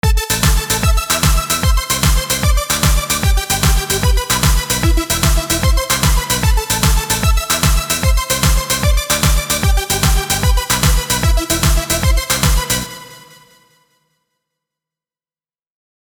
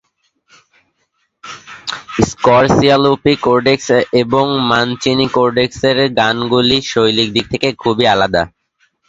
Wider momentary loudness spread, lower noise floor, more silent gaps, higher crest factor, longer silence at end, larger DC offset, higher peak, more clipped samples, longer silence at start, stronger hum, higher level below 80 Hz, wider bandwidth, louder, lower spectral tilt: second, 1 LU vs 10 LU; first, under -90 dBFS vs -65 dBFS; neither; about the same, 14 dB vs 14 dB; first, 2.85 s vs 0.6 s; neither; about the same, 0 dBFS vs 0 dBFS; neither; second, 0.05 s vs 1.45 s; neither; first, -18 dBFS vs -42 dBFS; first, over 20 kHz vs 8 kHz; about the same, -14 LUFS vs -13 LUFS; second, -3 dB/octave vs -5 dB/octave